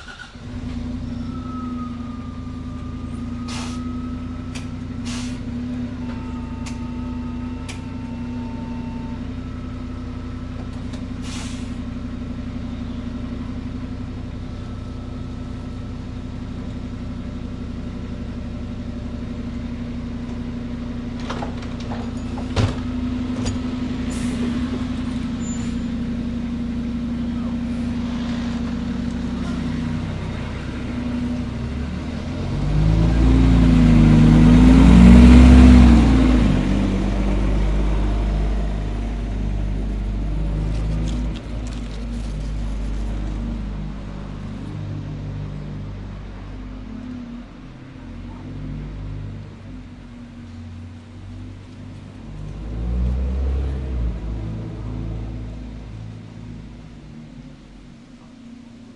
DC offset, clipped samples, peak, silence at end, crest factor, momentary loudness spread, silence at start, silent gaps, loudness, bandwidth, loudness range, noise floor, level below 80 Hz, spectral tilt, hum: under 0.1%; under 0.1%; 0 dBFS; 0 s; 20 dB; 20 LU; 0 s; none; -22 LUFS; 11 kHz; 21 LU; -42 dBFS; -24 dBFS; -7.5 dB/octave; none